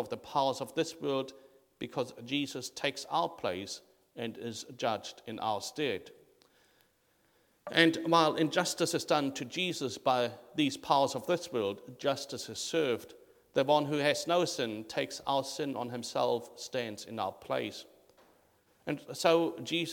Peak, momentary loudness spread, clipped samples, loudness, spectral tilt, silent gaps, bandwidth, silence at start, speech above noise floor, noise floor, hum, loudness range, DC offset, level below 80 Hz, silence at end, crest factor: -8 dBFS; 12 LU; under 0.1%; -33 LUFS; -4 dB/octave; none; 19 kHz; 0 s; 39 dB; -71 dBFS; none; 7 LU; under 0.1%; -76 dBFS; 0 s; 26 dB